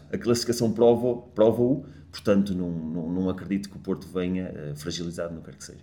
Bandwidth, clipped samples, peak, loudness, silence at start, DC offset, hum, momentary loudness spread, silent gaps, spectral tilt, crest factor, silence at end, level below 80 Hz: 19 kHz; under 0.1%; -6 dBFS; -26 LUFS; 0.1 s; under 0.1%; none; 14 LU; none; -6 dB/octave; 20 dB; 0 s; -54 dBFS